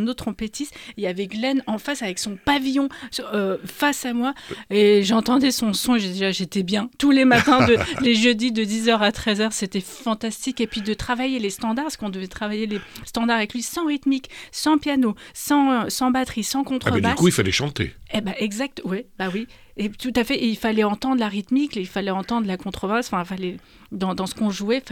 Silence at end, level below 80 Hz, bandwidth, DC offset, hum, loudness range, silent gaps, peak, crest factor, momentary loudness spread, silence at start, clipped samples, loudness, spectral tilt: 0 s; -48 dBFS; 18.5 kHz; under 0.1%; none; 7 LU; none; -4 dBFS; 18 dB; 11 LU; 0 s; under 0.1%; -22 LUFS; -4.5 dB/octave